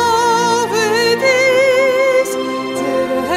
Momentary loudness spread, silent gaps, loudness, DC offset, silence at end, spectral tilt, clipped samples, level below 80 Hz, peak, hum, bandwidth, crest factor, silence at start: 7 LU; none; -14 LUFS; under 0.1%; 0 s; -3 dB/octave; under 0.1%; -54 dBFS; -2 dBFS; none; 16 kHz; 12 dB; 0 s